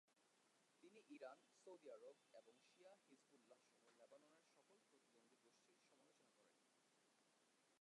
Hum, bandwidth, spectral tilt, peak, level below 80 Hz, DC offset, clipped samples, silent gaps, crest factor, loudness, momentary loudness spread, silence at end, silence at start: none; 11 kHz; -3 dB/octave; -48 dBFS; under -90 dBFS; under 0.1%; under 0.1%; none; 22 dB; -64 LUFS; 5 LU; 0 s; 0.05 s